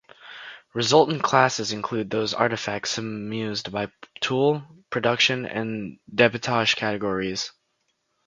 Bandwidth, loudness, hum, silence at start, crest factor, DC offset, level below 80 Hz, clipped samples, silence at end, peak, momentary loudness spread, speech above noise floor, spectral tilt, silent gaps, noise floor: 9.4 kHz; -24 LUFS; none; 0.2 s; 24 dB; under 0.1%; -62 dBFS; under 0.1%; 0.75 s; 0 dBFS; 13 LU; 49 dB; -4 dB/octave; none; -73 dBFS